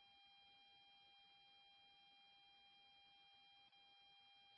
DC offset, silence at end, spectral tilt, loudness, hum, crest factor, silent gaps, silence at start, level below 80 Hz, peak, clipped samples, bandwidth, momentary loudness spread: under 0.1%; 0 s; 2.5 dB/octave; -68 LUFS; none; 10 dB; none; 0 s; under -90 dBFS; -62 dBFS; under 0.1%; 5.6 kHz; 1 LU